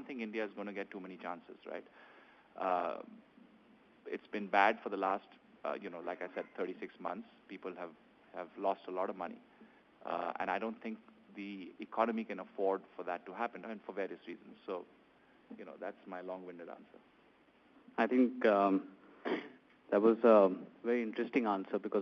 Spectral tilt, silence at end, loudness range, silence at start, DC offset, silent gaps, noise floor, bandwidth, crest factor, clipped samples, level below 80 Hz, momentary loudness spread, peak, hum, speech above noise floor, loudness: -4 dB/octave; 0 s; 13 LU; 0 s; under 0.1%; none; -67 dBFS; 6.6 kHz; 24 dB; under 0.1%; -84 dBFS; 20 LU; -14 dBFS; none; 31 dB; -36 LUFS